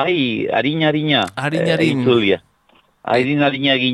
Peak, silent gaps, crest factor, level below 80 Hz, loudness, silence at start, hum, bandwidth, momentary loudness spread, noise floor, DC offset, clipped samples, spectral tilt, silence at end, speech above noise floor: -2 dBFS; none; 14 dB; -58 dBFS; -17 LUFS; 0 s; none; 12 kHz; 5 LU; -56 dBFS; under 0.1%; under 0.1%; -6 dB/octave; 0 s; 39 dB